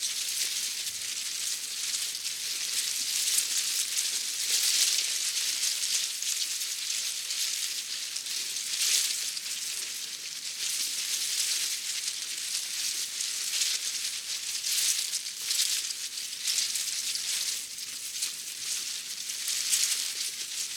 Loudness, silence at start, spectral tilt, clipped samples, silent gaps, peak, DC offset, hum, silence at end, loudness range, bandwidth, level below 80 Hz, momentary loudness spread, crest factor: -28 LUFS; 0 s; 4 dB/octave; under 0.1%; none; -8 dBFS; under 0.1%; none; 0 s; 4 LU; 17.5 kHz; -82 dBFS; 7 LU; 24 dB